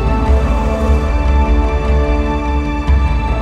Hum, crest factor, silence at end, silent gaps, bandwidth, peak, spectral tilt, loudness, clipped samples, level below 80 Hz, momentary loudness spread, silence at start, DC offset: none; 10 dB; 0 s; none; 7.4 kHz; -2 dBFS; -8 dB/octave; -15 LUFS; under 0.1%; -14 dBFS; 3 LU; 0 s; under 0.1%